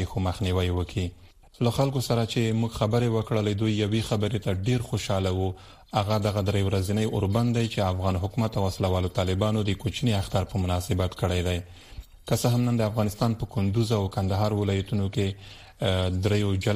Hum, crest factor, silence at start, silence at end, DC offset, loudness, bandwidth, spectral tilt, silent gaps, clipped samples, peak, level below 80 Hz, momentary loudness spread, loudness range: none; 18 dB; 0 s; 0 s; 0.1%; -26 LUFS; 15 kHz; -6.5 dB/octave; none; under 0.1%; -8 dBFS; -46 dBFS; 5 LU; 1 LU